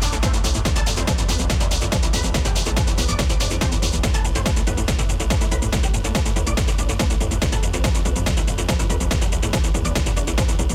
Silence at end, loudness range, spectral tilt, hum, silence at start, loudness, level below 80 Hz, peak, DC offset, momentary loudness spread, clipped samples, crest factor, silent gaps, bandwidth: 0 s; 0 LU; -4.5 dB/octave; none; 0 s; -21 LUFS; -20 dBFS; -10 dBFS; under 0.1%; 1 LU; under 0.1%; 10 dB; none; 15.5 kHz